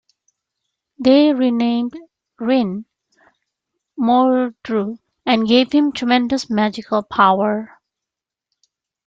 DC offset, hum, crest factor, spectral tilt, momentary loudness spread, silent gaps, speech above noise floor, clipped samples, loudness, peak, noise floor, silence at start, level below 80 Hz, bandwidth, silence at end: under 0.1%; none; 18 dB; -5.5 dB/octave; 13 LU; none; 69 dB; under 0.1%; -17 LUFS; -2 dBFS; -86 dBFS; 1 s; -60 dBFS; 7.8 kHz; 1.4 s